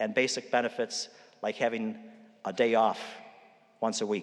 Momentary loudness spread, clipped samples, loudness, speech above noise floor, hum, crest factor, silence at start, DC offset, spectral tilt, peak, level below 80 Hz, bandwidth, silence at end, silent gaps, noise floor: 15 LU; under 0.1%; -30 LUFS; 28 dB; none; 18 dB; 0 s; under 0.1%; -3 dB/octave; -12 dBFS; under -90 dBFS; 11.5 kHz; 0 s; none; -58 dBFS